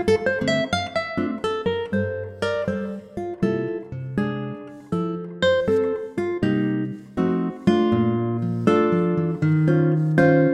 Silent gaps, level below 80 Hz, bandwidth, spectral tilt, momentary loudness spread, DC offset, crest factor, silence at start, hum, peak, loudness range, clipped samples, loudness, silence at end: none; -54 dBFS; 10.5 kHz; -7.5 dB/octave; 10 LU; under 0.1%; 18 dB; 0 s; none; -4 dBFS; 6 LU; under 0.1%; -23 LUFS; 0 s